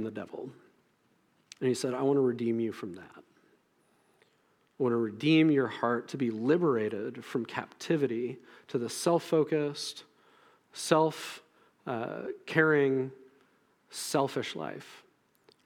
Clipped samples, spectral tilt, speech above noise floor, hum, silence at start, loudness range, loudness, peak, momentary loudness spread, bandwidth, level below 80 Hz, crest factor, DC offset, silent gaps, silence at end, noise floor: under 0.1%; -5.5 dB/octave; 40 dB; none; 0 s; 4 LU; -30 LUFS; -10 dBFS; 17 LU; 17.5 kHz; -84 dBFS; 22 dB; under 0.1%; none; 0.65 s; -70 dBFS